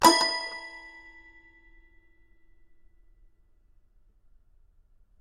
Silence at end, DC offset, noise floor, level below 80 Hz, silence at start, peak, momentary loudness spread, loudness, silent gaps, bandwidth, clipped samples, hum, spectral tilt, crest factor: 4.35 s; under 0.1%; -61 dBFS; -60 dBFS; 0 s; -4 dBFS; 30 LU; -26 LUFS; none; 14.5 kHz; under 0.1%; none; -1 dB/octave; 28 dB